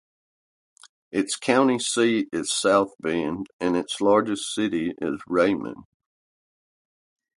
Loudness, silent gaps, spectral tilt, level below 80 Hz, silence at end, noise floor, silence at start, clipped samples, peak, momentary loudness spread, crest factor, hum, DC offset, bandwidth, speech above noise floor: -23 LUFS; 3.53-3.59 s; -3.5 dB/octave; -62 dBFS; 1.55 s; under -90 dBFS; 1.15 s; under 0.1%; -4 dBFS; 8 LU; 20 dB; none; under 0.1%; 11.5 kHz; over 67 dB